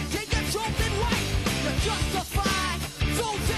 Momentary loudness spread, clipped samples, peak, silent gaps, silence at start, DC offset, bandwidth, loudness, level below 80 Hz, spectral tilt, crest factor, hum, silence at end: 2 LU; under 0.1%; -14 dBFS; none; 0 s; under 0.1%; 13.5 kHz; -26 LUFS; -32 dBFS; -4 dB/octave; 14 dB; none; 0 s